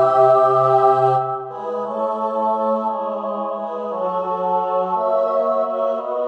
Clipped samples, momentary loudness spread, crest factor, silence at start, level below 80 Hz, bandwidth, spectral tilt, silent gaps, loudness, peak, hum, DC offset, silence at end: under 0.1%; 11 LU; 16 dB; 0 s; -82 dBFS; 8.2 kHz; -8 dB/octave; none; -19 LUFS; -2 dBFS; none; under 0.1%; 0 s